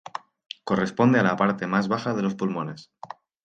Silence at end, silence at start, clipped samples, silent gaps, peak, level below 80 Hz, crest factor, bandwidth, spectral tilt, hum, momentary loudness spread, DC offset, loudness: 0.4 s; 0.15 s; under 0.1%; none; -6 dBFS; -64 dBFS; 18 dB; 8.8 kHz; -7 dB/octave; none; 22 LU; under 0.1%; -24 LUFS